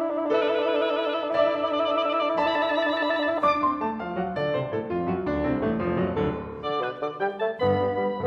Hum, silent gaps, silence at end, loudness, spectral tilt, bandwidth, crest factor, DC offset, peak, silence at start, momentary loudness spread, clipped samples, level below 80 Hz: none; none; 0 s; -25 LUFS; -7.5 dB/octave; 6.8 kHz; 14 dB; under 0.1%; -10 dBFS; 0 s; 6 LU; under 0.1%; -50 dBFS